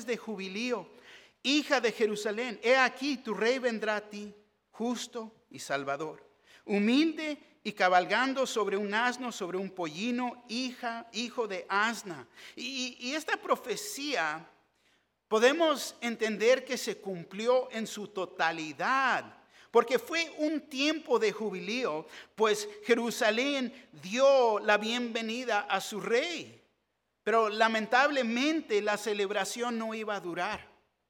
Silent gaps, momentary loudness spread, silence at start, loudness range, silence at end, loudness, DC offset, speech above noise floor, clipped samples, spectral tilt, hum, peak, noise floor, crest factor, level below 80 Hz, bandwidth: none; 12 LU; 0 s; 5 LU; 0.45 s; -30 LUFS; under 0.1%; 49 dB; under 0.1%; -3 dB/octave; none; -10 dBFS; -80 dBFS; 22 dB; -80 dBFS; 17.5 kHz